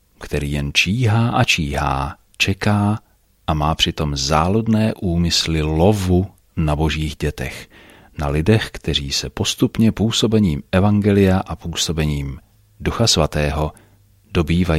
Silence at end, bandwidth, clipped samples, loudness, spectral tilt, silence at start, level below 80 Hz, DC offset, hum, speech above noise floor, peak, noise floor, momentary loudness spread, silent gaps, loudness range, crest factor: 0 s; 15.5 kHz; under 0.1%; -18 LUFS; -5 dB/octave; 0.2 s; -32 dBFS; under 0.1%; none; 33 dB; -2 dBFS; -51 dBFS; 11 LU; none; 3 LU; 18 dB